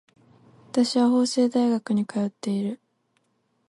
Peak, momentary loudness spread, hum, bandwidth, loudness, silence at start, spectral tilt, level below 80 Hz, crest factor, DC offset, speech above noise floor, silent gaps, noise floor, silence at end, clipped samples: -10 dBFS; 8 LU; none; 11.5 kHz; -24 LUFS; 0.75 s; -5.5 dB/octave; -74 dBFS; 16 dB; under 0.1%; 48 dB; none; -71 dBFS; 0.95 s; under 0.1%